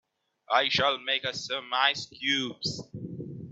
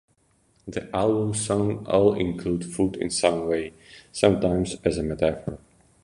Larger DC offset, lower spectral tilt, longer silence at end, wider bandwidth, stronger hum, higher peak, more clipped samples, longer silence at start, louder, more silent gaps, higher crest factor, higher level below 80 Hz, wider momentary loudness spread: neither; second, -3 dB/octave vs -5.5 dB/octave; second, 0 s vs 0.45 s; second, 8.4 kHz vs 11.5 kHz; neither; second, -8 dBFS vs -2 dBFS; neither; second, 0.5 s vs 0.65 s; second, -27 LUFS vs -24 LUFS; neither; about the same, 22 dB vs 22 dB; second, -68 dBFS vs -46 dBFS; about the same, 15 LU vs 14 LU